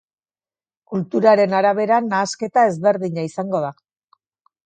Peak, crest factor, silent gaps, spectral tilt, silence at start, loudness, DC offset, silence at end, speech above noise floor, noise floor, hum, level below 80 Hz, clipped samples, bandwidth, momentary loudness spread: -2 dBFS; 18 dB; none; -5.5 dB/octave; 0.9 s; -18 LUFS; under 0.1%; 0.95 s; over 72 dB; under -90 dBFS; none; -70 dBFS; under 0.1%; 9.2 kHz; 11 LU